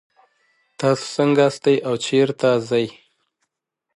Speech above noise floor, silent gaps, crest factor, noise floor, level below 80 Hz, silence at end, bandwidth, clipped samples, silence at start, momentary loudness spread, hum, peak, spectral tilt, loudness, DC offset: 61 dB; none; 16 dB; -79 dBFS; -68 dBFS; 1.05 s; 11.5 kHz; under 0.1%; 0.8 s; 6 LU; none; -4 dBFS; -5.5 dB/octave; -19 LUFS; under 0.1%